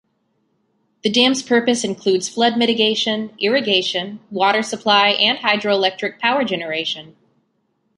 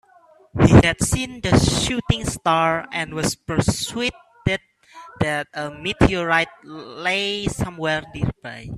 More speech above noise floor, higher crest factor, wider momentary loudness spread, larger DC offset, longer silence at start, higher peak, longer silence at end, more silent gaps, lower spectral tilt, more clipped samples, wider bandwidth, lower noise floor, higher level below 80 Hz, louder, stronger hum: first, 49 dB vs 31 dB; about the same, 18 dB vs 20 dB; second, 8 LU vs 11 LU; neither; first, 1.05 s vs 0.55 s; about the same, 0 dBFS vs 0 dBFS; first, 0.9 s vs 0 s; neither; second, -3 dB/octave vs -5 dB/octave; neither; second, 11.5 kHz vs 13.5 kHz; first, -67 dBFS vs -53 dBFS; second, -66 dBFS vs -36 dBFS; first, -17 LUFS vs -21 LUFS; neither